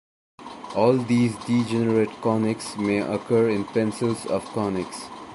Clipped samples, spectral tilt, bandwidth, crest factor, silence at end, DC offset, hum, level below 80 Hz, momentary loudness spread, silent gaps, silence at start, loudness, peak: under 0.1%; -6.5 dB/octave; 11.5 kHz; 18 dB; 0 s; under 0.1%; none; -58 dBFS; 9 LU; none; 0.4 s; -24 LUFS; -6 dBFS